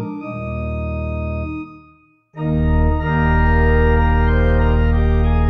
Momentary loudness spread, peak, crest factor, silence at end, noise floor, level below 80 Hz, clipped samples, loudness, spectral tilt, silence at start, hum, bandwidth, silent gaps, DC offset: 11 LU; -4 dBFS; 12 dB; 0 s; -51 dBFS; -20 dBFS; under 0.1%; -18 LUFS; -10 dB/octave; 0 s; none; 4 kHz; none; under 0.1%